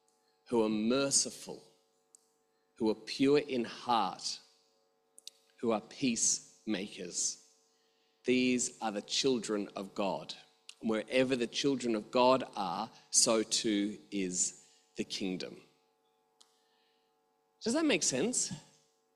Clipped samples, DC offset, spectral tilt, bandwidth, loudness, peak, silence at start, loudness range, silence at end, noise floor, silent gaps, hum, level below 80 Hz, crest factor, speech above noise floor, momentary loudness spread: under 0.1%; under 0.1%; -2.5 dB/octave; 14 kHz; -32 LUFS; -12 dBFS; 0.5 s; 6 LU; 0.55 s; -75 dBFS; none; none; -74 dBFS; 22 dB; 43 dB; 14 LU